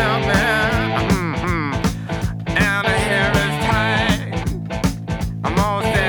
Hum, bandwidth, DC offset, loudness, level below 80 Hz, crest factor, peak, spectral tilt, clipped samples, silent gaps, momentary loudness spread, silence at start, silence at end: none; over 20 kHz; under 0.1%; -19 LUFS; -30 dBFS; 16 dB; -4 dBFS; -5 dB/octave; under 0.1%; none; 8 LU; 0 s; 0 s